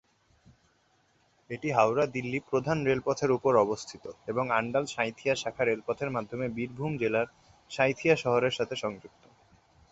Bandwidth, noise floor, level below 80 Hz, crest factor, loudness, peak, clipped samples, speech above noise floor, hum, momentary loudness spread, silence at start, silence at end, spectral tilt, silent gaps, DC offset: 8 kHz; -68 dBFS; -64 dBFS; 20 dB; -29 LUFS; -10 dBFS; under 0.1%; 40 dB; none; 11 LU; 1.5 s; 0.85 s; -5.5 dB/octave; none; under 0.1%